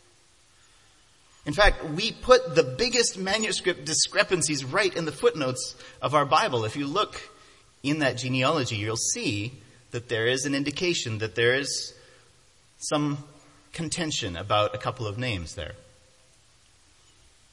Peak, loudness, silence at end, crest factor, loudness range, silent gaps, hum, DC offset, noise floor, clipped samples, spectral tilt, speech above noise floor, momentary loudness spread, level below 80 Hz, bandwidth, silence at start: -4 dBFS; -25 LUFS; 1.7 s; 24 dB; 7 LU; none; none; under 0.1%; -60 dBFS; under 0.1%; -3.5 dB/octave; 34 dB; 14 LU; -44 dBFS; 11.5 kHz; 1.45 s